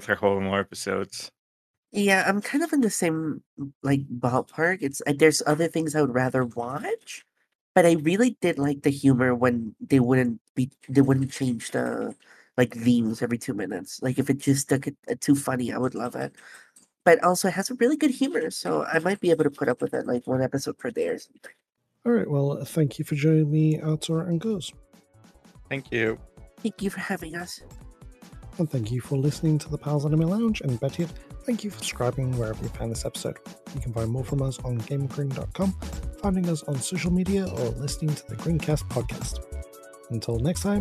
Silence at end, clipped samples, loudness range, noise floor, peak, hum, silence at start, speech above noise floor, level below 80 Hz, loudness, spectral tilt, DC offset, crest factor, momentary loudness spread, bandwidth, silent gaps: 0 s; under 0.1%; 7 LU; -56 dBFS; -4 dBFS; none; 0 s; 31 dB; -46 dBFS; -26 LUFS; -6 dB/octave; under 0.1%; 20 dB; 13 LU; 14 kHz; 1.39-1.83 s, 3.46-3.57 s, 3.75-3.81 s, 7.55-7.75 s, 10.41-10.55 s, 14.99-15.03 s